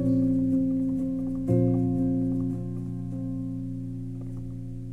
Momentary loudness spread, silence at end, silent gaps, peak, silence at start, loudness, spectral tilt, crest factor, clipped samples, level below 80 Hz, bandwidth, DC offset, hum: 12 LU; 0 s; none; -12 dBFS; 0 s; -28 LUFS; -11.5 dB/octave; 16 dB; under 0.1%; -44 dBFS; 2.6 kHz; under 0.1%; none